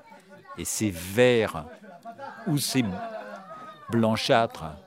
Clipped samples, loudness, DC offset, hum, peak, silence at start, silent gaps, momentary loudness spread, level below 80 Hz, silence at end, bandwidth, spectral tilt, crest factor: under 0.1%; -26 LUFS; under 0.1%; none; -6 dBFS; 0.1 s; none; 21 LU; -62 dBFS; 0.05 s; 16 kHz; -4.5 dB/octave; 22 dB